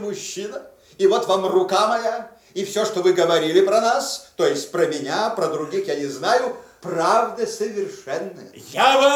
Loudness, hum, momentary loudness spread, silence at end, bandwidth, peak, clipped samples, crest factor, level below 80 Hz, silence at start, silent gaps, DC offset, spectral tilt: -21 LUFS; none; 13 LU; 0 s; 16.5 kHz; -4 dBFS; under 0.1%; 16 dB; -70 dBFS; 0 s; none; under 0.1%; -3.5 dB/octave